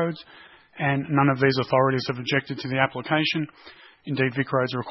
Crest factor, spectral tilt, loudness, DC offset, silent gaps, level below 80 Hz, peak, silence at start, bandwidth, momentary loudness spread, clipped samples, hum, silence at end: 22 dB; -7 dB/octave; -24 LUFS; under 0.1%; none; -64 dBFS; -4 dBFS; 0 s; 6 kHz; 8 LU; under 0.1%; none; 0 s